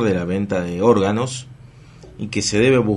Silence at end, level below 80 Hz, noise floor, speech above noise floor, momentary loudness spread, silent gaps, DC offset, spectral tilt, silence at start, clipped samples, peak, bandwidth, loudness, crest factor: 0 s; -48 dBFS; -43 dBFS; 25 dB; 11 LU; none; under 0.1%; -5.5 dB/octave; 0 s; under 0.1%; -2 dBFS; 11.5 kHz; -19 LUFS; 18 dB